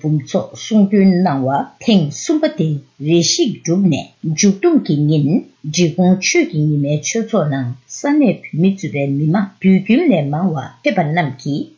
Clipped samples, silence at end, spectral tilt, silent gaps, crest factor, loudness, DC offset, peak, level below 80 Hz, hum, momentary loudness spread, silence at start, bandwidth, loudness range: under 0.1%; 0.1 s; -5.5 dB/octave; none; 12 dB; -16 LUFS; under 0.1%; -2 dBFS; -60 dBFS; none; 8 LU; 0.05 s; 7.4 kHz; 1 LU